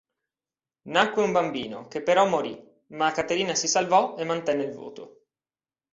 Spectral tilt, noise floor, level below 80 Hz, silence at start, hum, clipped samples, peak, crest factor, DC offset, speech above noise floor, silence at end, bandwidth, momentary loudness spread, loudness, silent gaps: -3 dB/octave; under -90 dBFS; -68 dBFS; 0.85 s; none; under 0.1%; -4 dBFS; 22 dB; under 0.1%; over 65 dB; 0.85 s; 7.8 kHz; 17 LU; -25 LUFS; none